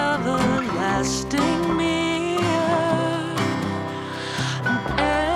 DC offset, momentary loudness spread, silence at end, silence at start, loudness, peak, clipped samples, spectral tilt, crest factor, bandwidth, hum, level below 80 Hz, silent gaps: under 0.1%; 5 LU; 0 s; 0 s; -22 LUFS; -6 dBFS; under 0.1%; -5 dB/octave; 16 dB; 14.5 kHz; none; -42 dBFS; none